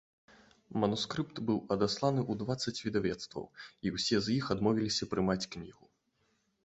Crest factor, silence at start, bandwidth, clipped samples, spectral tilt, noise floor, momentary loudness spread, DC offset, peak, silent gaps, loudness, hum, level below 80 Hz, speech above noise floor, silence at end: 20 dB; 0.7 s; 8.2 kHz; under 0.1%; -5 dB/octave; -76 dBFS; 11 LU; under 0.1%; -14 dBFS; none; -33 LUFS; none; -62 dBFS; 43 dB; 0.95 s